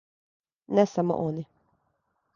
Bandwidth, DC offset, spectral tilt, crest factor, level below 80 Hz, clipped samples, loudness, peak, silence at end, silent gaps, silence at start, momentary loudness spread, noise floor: 7.2 kHz; under 0.1%; -7.5 dB/octave; 22 dB; -68 dBFS; under 0.1%; -26 LUFS; -8 dBFS; 0.9 s; none; 0.7 s; 14 LU; -75 dBFS